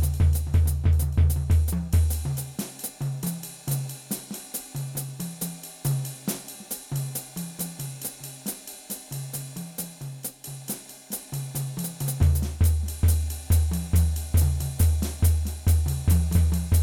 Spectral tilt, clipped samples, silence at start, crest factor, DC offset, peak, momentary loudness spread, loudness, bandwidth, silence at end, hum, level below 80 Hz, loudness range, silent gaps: -5.5 dB/octave; under 0.1%; 0 s; 16 dB; under 0.1%; -10 dBFS; 12 LU; -27 LUFS; 19.5 kHz; 0 s; none; -32 dBFS; 10 LU; none